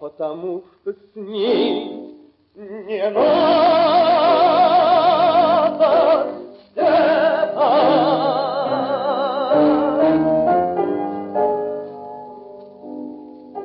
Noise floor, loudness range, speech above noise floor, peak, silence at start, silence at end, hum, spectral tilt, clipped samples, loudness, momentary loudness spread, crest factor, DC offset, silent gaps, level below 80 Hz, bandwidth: -43 dBFS; 7 LU; 25 dB; -4 dBFS; 0 s; 0 s; none; -10 dB/octave; under 0.1%; -17 LUFS; 20 LU; 12 dB; under 0.1%; none; -60 dBFS; 5.6 kHz